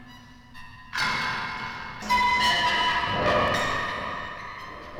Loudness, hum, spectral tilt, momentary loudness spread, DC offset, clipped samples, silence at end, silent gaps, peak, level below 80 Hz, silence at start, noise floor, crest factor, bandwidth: -25 LUFS; none; -3 dB/octave; 16 LU; under 0.1%; under 0.1%; 0 s; none; -10 dBFS; -48 dBFS; 0 s; -48 dBFS; 16 dB; 19 kHz